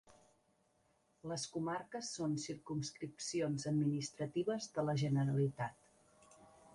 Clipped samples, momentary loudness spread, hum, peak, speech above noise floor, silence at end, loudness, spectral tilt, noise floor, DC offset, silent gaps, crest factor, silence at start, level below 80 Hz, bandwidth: under 0.1%; 9 LU; none; -24 dBFS; 37 dB; 0.05 s; -40 LUFS; -5.5 dB/octave; -76 dBFS; under 0.1%; none; 16 dB; 0.05 s; -74 dBFS; 11.5 kHz